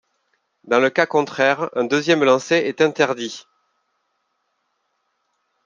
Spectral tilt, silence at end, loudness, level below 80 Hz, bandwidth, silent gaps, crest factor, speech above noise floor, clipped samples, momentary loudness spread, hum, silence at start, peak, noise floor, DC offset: -4.5 dB/octave; 2.25 s; -18 LUFS; -72 dBFS; 7.6 kHz; none; 20 dB; 53 dB; under 0.1%; 6 LU; none; 0.65 s; -2 dBFS; -71 dBFS; under 0.1%